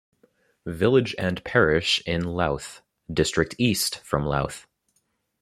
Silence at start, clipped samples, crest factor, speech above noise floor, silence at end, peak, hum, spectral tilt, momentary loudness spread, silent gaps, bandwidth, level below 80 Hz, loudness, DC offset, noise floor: 0.65 s; under 0.1%; 20 dB; 48 dB; 0.8 s; -4 dBFS; none; -4.5 dB/octave; 12 LU; none; 14.5 kHz; -46 dBFS; -24 LUFS; under 0.1%; -72 dBFS